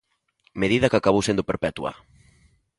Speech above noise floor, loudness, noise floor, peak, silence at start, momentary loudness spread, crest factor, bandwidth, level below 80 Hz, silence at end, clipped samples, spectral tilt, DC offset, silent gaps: 44 dB; -23 LUFS; -66 dBFS; -4 dBFS; 0.55 s; 14 LU; 20 dB; 11.5 kHz; -48 dBFS; 0.85 s; under 0.1%; -5.5 dB/octave; under 0.1%; none